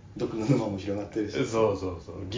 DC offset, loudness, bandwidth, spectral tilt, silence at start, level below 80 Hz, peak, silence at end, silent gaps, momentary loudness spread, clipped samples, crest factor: under 0.1%; -29 LUFS; 7.6 kHz; -7 dB/octave; 0.05 s; -50 dBFS; -10 dBFS; 0 s; none; 8 LU; under 0.1%; 20 dB